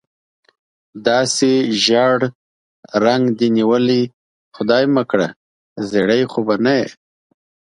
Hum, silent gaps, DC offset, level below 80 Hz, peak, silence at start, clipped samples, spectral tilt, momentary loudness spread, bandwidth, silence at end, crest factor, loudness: none; 2.35-2.83 s, 4.13-4.52 s, 5.36-5.76 s; under 0.1%; -62 dBFS; 0 dBFS; 0.95 s; under 0.1%; -4.5 dB/octave; 9 LU; 11.5 kHz; 0.85 s; 18 dB; -16 LUFS